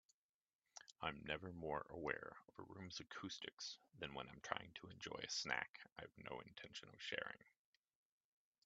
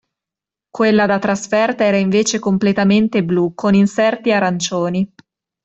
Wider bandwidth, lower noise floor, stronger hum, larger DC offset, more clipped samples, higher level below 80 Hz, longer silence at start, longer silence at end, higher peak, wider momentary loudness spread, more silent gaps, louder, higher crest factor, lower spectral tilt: about the same, 8.8 kHz vs 8.2 kHz; about the same, under -90 dBFS vs -87 dBFS; neither; neither; neither; second, -76 dBFS vs -54 dBFS; about the same, 0.75 s vs 0.75 s; first, 1.15 s vs 0.6 s; second, -22 dBFS vs -2 dBFS; first, 12 LU vs 5 LU; first, 3.53-3.57 s, 5.69-5.74 s, 5.92-5.96 s vs none; second, -50 LUFS vs -16 LUFS; first, 30 dB vs 14 dB; second, -3 dB/octave vs -5.5 dB/octave